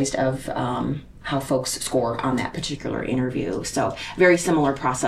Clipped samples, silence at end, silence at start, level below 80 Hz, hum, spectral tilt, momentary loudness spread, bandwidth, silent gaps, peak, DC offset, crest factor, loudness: under 0.1%; 0 s; 0 s; -46 dBFS; none; -4.5 dB/octave; 10 LU; 14.5 kHz; none; -4 dBFS; under 0.1%; 18 dB; -23 LUFS